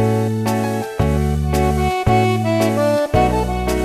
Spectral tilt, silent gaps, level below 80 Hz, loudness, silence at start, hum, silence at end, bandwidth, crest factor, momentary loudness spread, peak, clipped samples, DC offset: -6.5 dB/octave; none; -26 dBFS; -17 LUFS; 0 s; none; 0 s; 14 kHz; 16 dB; 4 LU; -2 dBFS; under 0.1%; under 0.1%